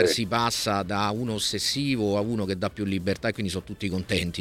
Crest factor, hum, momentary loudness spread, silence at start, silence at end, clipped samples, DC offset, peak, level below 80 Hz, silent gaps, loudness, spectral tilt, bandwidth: 20 dB; none; 7 LU; 0 s; 0 s; under 0.1%; under 0.1%; -6 dBFS; -50 dBFS; none; -26 LUFS; -4.5 dB/octave; 16.5 kHz